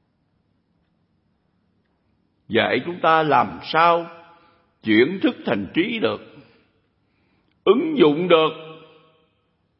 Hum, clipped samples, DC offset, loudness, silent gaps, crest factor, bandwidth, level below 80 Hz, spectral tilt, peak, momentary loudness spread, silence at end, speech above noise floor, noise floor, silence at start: none; under 0.1%; under 0.1%; -19 LUFS; none; 20 dB; 5.8 kHz; -64 dBFS; -10 dB/octave; -2 dBFS; 9 LU; 1 s; 49 dB; -67 dBFS; 2.5 s